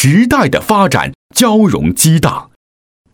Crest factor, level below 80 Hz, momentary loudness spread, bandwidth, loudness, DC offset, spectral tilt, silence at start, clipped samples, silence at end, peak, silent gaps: 12 dB; -36 dBFS; 7 LU; over 20 kHz; -11 LUFS; under 0.1%; -5 dB/octave; 0 s; under 0.1%; 0.7 s; 0 dBFS; 1.15-1.30 s